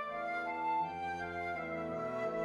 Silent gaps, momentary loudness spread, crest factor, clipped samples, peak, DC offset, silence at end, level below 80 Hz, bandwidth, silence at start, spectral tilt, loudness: none; 4 LU; 12 dB; under 0.1%; -26 dBFS; under 0.1%; 0 s; -68 dBFS; 12 kHz; 0 s; -6 dB/octave; -38 LUFS